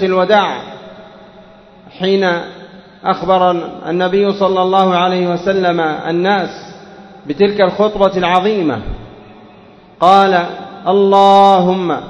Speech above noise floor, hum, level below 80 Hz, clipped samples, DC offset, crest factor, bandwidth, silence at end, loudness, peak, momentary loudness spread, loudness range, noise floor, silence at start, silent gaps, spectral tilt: 29 dB; none; -42 dBFS; 0.2%; under 0.1%; 14 dB; 8.4 kHz; 0 s; -13 LUFS; 0 dBFS; 16 LU; 5 LU; -41 dBFS; 0 s; none; -6.5 dB/octave